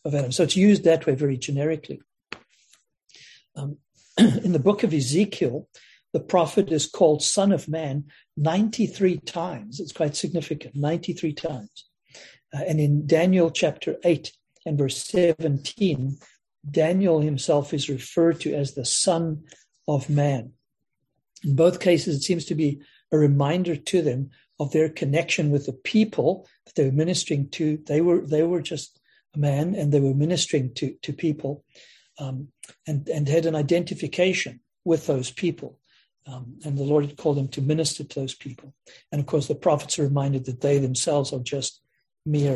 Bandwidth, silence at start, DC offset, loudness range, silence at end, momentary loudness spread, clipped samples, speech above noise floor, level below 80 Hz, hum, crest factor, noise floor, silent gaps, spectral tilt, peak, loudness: 12 kHz; 0.05 s; under 0.1%; 4 LU; 0 s; 15 LU; under 0.1%; 57 dB; -62 dBFS; none; 20 dB; -80 dBFS; none; -5.5 dB/octave; -4 dBFS; -24 LUFS